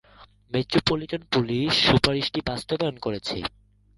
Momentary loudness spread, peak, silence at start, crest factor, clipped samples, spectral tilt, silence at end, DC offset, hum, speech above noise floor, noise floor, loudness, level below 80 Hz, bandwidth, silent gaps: 11 LU; -4 dBFS; 0.2 s; 22 dB; under 0.1%; -5 dB/octave; 0.5 s; under 0.1%; none; 29 dB; -53 dBFS; -24 LUFS; -46 dBFS; 11.5 kHz; none